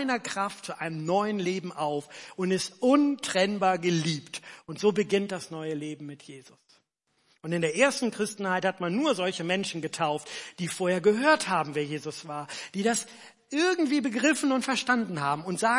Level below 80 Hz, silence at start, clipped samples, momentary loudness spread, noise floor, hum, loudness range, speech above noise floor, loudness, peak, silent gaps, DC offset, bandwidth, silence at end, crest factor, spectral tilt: -78 dBFS; 0 s; under 0.1%; 12 LU; -72 dBFS; none; 4 LU; 45 dB; -28 LUFS; -6 dBFS; none; under 0.1%; 11.5 kHz; 0 s; 22 dB; -4.5 dB/octave